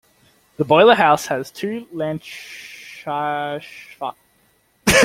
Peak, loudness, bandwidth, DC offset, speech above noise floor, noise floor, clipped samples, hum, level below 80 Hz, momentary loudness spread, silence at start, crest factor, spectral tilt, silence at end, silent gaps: 0 dBFS; -19 LUFS; 16.5 kHz; under 0.1%; 41 dB; -60 dBFS; under 0.1%; none; -46 dBFS; 22 LU; 0.6 s; 18 dB; -3.5 dB/octave; 0 s; none